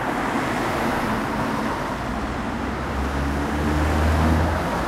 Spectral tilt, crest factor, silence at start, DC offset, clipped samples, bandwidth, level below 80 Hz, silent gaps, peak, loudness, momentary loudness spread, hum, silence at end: -6 dB/octave; 16 dB; 0 s; under 0.1%; under 0.1%; 15.5 kHz; -30 dBFS; none; -8 dBFS; -23 LUFS; 7 LU; none; 0 s